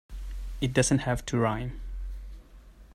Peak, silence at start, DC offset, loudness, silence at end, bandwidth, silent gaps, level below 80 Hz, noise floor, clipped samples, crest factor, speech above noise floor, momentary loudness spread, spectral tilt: -10 dBFS; 0.1 s; under 0.1%; -28 LUFS; 0 s; 15 kHz; none; -40 dBFS; -51 dBFS; under 0.1%; 20 dB; 24 dB; 18 LU; -5 dB/octave